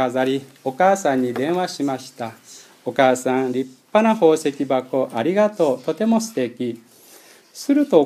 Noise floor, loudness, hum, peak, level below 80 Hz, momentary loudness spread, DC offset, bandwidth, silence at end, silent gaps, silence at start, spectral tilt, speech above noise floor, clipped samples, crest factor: -48 dBFS; -20 LUFS; none; 0 dBFS; -74 dBFS; 12 LU; under 0.1%; 15 kHz; 0 s; none; 0 s; -5 dB/octave; 28 dB; under 0.1%; 20 dB